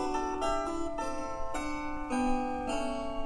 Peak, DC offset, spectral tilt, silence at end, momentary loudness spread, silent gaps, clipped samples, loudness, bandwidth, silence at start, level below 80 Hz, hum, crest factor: -18 dBFS; 0.3%; -4.5 dB/octave; 0 s; 5 LU; none; under 0.1%; -34 LUFS; 11 kHz; 0 s; -42 dBFS; none; 14 dB